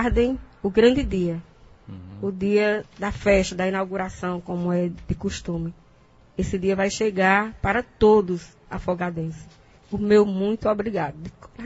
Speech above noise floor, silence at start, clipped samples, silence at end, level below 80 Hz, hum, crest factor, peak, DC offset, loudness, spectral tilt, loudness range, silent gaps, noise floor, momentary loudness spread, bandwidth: 31 dB; 0 s; under 0.1%; 0 s; -40 dBFS; none; 20 dB; -4 dBFS; under 0.1%; -23 LUFS; -6 dB/octave; 4 LU; none; -54 dBFS; 15 LU; 8 kHz